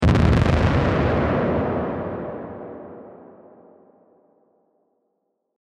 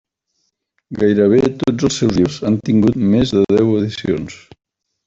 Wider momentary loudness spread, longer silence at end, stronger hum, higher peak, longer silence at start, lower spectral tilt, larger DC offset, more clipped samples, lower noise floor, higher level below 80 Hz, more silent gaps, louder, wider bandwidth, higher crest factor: first, 21 LU vs 8 LU; first, 2.35 s vs 0.7 s; neither; about the same, -4 dBFS vs -2 dBFS; second, 0 s vs 0.9 s; first, -8 dB/octave vs -6.5 dB/octave; neither; neither; first, -74 dBFS vs -69 dBFS; first, -32 dBFS vs -44 dBFS; neither; second, -21 LUFS vs -15 LUFS; first, 9.4 kHz vs 8 kHz; first, 20 dB vs 14 dB